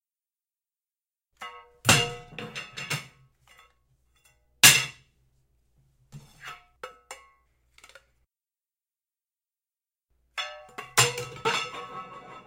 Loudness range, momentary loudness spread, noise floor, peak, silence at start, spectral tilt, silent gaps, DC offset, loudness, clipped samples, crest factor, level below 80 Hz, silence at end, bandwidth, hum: 11 LU; 28 LU; under -90 dBFS; -2 dBFS; 1.4 s; -1 dB/octave; none; under 0.1%; -23 LUFS; under 0.1%; 30 dB; -60 dBFS; 0.05 s; 16 kHz; none